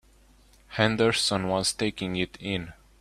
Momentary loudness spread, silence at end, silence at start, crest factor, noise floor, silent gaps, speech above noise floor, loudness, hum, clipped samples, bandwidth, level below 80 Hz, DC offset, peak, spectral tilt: 10 LU; 0.25 s; 0.7 s; 24 dB; -58 dBFS; none; 31 dB; -26 LUFS; none; under 0.1%; 15.5 kHz; -54 dBFS; under 0.1%; -4 dBFS; -4 dB/octave